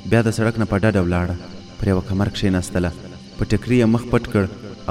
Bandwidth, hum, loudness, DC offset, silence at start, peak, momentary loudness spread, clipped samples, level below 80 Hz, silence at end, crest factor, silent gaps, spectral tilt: 13.5 kHz; none; -20 LUFS; under 0.1%; 0 s; -2 dBFS; 13 LU; under 0.1%; -36 dBFS; 0 s; 18 dB; none; -7 dB/octave